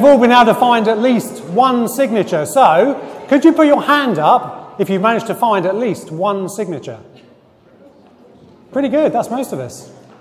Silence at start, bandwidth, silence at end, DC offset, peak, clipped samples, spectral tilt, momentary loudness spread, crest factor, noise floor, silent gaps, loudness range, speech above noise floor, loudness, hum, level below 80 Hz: 0 s; 16 kHz; 0.3 s; under 0.1%; 0 dBFS; under 0.1%; -5.5 dB/octave; 14 LU; 14 dB; -47 dBFS; none; 9 LU; 34 dB; -14 LUFS; none; -58 dBFS